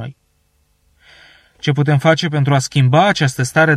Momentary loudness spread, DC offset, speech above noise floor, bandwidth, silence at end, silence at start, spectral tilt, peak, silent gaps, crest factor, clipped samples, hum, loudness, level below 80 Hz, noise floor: 7 LU; under 0.1%; 47 dB; 13 kHz; 0 s; 0 s; -5.5 dB/octave; -2 dBFS; none; 14 dB; under 0.1%; none; -15 LUFS; -52 dBFS; -61 dBFS